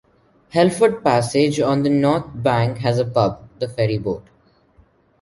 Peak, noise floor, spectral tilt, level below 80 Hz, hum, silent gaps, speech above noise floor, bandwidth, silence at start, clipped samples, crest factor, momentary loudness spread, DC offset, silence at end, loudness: -2 dBFS; -55 dBFS; -6.5 dB/octave; -50 dBFS; none; none; 37 dB; 11.5 kHz; 0.55 s; under 0.1%; 18 dB; 9 LU; under 0.1%; 1 s; -19 LUFS